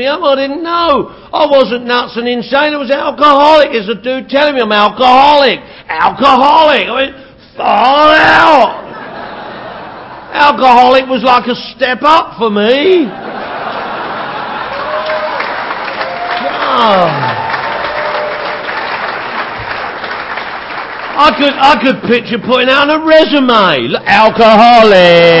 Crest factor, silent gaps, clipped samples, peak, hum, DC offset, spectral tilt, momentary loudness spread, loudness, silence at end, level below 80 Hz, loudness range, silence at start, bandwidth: 10 dB; none; 1%; 0 dBFS; none; under 0.1%; -5.5 dB/octave; 14 LU; -9 LUFS; 0 s; -44 dBFS; 7 LU; 0 s; 8 kHz